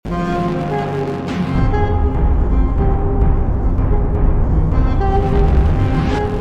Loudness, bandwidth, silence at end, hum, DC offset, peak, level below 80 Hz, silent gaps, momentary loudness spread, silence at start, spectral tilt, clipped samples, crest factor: -17 LUFS; 7 kHz; 0 s; none; under 0.1%; -2 dBFS; -16 dBFS; none; 4 LU; 0.05 s; -9 dB/octave; under 0.1%; 12 dB